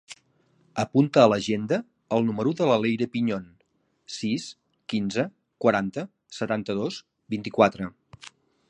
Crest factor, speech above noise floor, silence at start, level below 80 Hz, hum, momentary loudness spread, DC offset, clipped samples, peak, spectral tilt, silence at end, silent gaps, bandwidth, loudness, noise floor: 22 dB; 46 dB; 0.1 s; -64 dBFS; none; 18 LU; under 0.1%; under 0.1%; -4 dBFS; -6 dB/octave; 0.4 s; none; 10 kHz; -25 LUFS; -70 dBFS